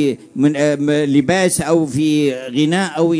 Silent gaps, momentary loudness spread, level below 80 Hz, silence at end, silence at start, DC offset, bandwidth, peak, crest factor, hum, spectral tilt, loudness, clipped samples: none; 3 LU; -52 dBFS; 0 s; 0 s; under 0.1%; 11 kHz; -2 dBFS; 14 dB; none; -5 dB/octave; -16 LUFS; under 0.1%